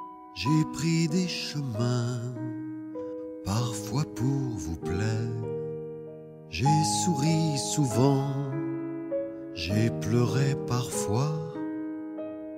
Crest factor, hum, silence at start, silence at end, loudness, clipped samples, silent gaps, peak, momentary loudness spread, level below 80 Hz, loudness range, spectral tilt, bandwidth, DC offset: 18 dB; none; 0 s; 0 s; -29 LUFS; under 0.1%; none; -10 dBFS; 13 LU; -54 dBFS; 5 LU; -5.5 dB/octave; 16 kHz; under 0.1%